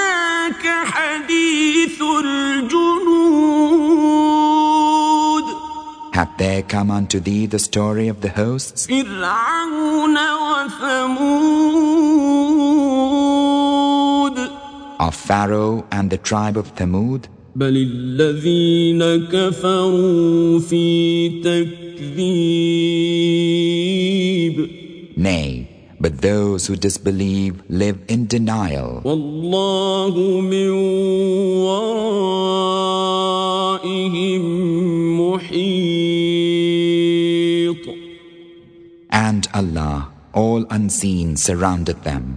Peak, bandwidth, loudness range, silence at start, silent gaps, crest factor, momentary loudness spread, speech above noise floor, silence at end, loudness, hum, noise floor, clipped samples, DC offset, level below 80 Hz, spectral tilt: 0 dBFS; 10 kHz; 5 LU; 0 s; none; 16 dB; 8 LU; 26 dB; 0 s; -17 LUFS; none; -44 dBFS; under 0.1%; under 0.1%; -42 dBFS; -5 dB/octave